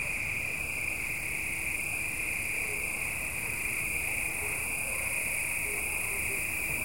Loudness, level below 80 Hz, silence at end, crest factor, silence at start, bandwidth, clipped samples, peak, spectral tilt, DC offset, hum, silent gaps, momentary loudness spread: -30 LUFS; -50 dBFS; 0 s; 14 dB; 0 s; 16.5 kHz; under 0.1%; -18 dBFS; -2 dB/octave; 0.4%; none; none; 2 LU